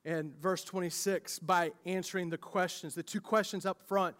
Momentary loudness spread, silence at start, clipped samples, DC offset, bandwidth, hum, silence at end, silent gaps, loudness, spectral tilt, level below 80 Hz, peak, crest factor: 7 LU; 0.05 s; under 0.1%; under 0.1%; 16 kHz; none; 0.05 s; none; -35 LUFS; -4 dB/octave; -84 dBFS; -16 dBFS; 20 dB